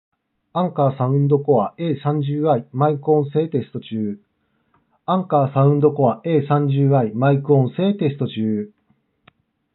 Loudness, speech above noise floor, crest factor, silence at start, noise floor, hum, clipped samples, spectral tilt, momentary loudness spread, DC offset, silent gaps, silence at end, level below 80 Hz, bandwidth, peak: -19 LUFS; 47 dB; 16 dB; 0.55 s; -65 dBFS; none; under 0.1%; -8.5 dB/octave; 10 LU; under 0.1%; none; 1.05 s; -76 dBFS; 4.1 kHz; -4 dBFS